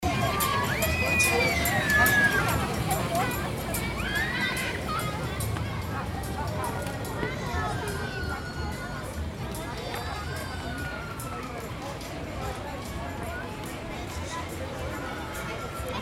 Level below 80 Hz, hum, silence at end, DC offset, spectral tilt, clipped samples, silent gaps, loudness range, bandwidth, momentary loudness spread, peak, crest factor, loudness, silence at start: -40 dBFS; none; 0 s; under 0.1%; -4 dB/octave; under 0.1%; none; 11 LU; 16.5 kHz; 13 LU; -10 dBFS; 20 dB; -29 LUFS; 0 s